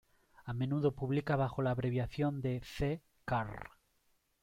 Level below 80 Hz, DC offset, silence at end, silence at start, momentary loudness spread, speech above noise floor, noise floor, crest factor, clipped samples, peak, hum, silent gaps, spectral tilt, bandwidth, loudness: -56 dBFS; under 0.1%; 0.75 s; 0.4 s; 11 LU; 41 dB; -75 dBFS; 18 dB; under 0.1%; -20 dBFS; none; none; -8 dB/octave; 13.5 kHz; -36 LUFS